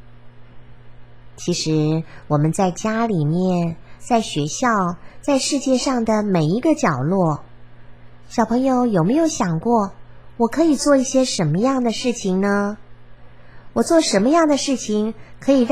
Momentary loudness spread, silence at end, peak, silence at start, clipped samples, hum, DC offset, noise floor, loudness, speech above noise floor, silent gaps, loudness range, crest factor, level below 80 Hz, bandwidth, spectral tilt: 9 LU; 0 s; -2 dBFS; 0.25 s; under 0.1%; none; 0.9%; -43 dBFS; -19 LUFS; 25 dB; none; 2 LU; 18 dB; -50 dBFS; 14.5 kHz; -5.5 dB/octave